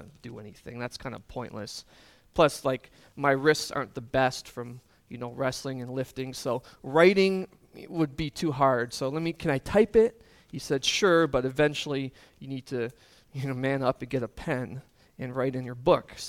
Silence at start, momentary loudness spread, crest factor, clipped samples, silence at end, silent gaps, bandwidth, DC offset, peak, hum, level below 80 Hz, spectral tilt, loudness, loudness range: 0 s; 18 LU; 22 dB; under 0.1%; 0 s; none; 16 kHz; under 0.1%; -6 dBFS; none; -54 dBFS; -5 dB/octave; -27 LUFS; 6 LU